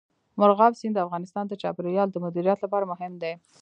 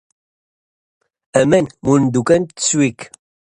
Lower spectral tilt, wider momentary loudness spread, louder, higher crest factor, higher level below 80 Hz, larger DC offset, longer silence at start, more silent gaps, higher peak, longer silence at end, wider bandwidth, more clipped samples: first, -7.5 dB/octave vs -5 dB/octave; first, 13 LU vs 6 LU; second, -25 LUFS vs -16 LUFS; about the same, 20 dB vs 18 dB; second, -76 dBFS vs -52 dBFS; neither; second, 0.35 s vs 1.35 s; neither; second, -4 dBFS vs 0 dBFS; second, 0.25 s vs 0.55 s; second, 9 kHz vs 11 kHz; neither